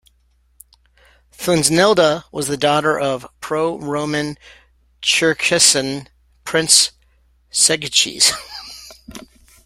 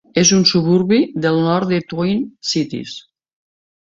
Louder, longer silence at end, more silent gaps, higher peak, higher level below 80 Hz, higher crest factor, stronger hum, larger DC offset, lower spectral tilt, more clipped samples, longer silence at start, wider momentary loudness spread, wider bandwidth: about the same, -15 LUFS vs -16 LUFS; second, 0.45 s vs 1 s; neither; about the same, 0 dBFS vs -2 dBFS; about the same, -52 dBFS vs -54 dBFS; about the same, 20 dB vs 16 dB; neither; neither; second, -2 dB/octave vs -4.5 dB/octave; neither; first, 1.4 s vs 0.15 s; first, 20 LU vs 13 LU; first, 16.5 kHz vs 7.8 kHz